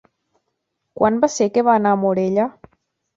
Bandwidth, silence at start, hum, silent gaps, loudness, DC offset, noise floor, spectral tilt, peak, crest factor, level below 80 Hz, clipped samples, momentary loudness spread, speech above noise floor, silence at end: 8 kHz; 0.95 s; none; none; -18 LUFS; under 0.1%; -75 dBFS; -6 dB/octave; -2 dBFS; 18 dB; -58 dBFS; under 0.1%; 5 LU; 58 dB; 0.65 s